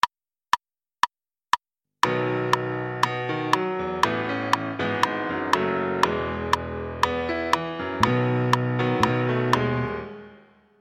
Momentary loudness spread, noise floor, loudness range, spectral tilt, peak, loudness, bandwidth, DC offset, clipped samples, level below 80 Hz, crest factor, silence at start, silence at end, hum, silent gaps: 5 LU; -53 dBFS; 2 LU; -5.5 dB/octave; -2 dBFS; -25 LUFS; 16 kHz; under 0.1%; under 0.1%; -50 dBFS; 24 dB; 0.05 s; 0.45 s; none; none